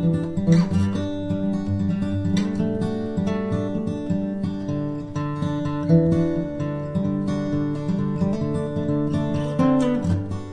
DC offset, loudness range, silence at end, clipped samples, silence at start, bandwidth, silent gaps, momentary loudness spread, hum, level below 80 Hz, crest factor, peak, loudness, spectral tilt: 0.2%; 2 LU; 0 s; under 0.1%; 0 s; 10 kHz; none; 7 LU; none; -44 dBFS; 16 dB; -6 dBFS; -23 LUFS; -8.5 dB/octave